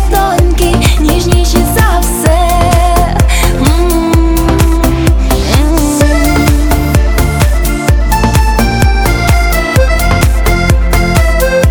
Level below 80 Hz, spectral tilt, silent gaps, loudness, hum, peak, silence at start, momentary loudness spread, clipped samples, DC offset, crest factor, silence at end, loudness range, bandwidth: -10 dBFS; -5.5 dB/octave; none; -10 LUFS; none; 0 dBFS; 0 s; 1 LU; 0.2%; under 0.1%; 8 dB; 0 s; 1 LU; over 20 kHz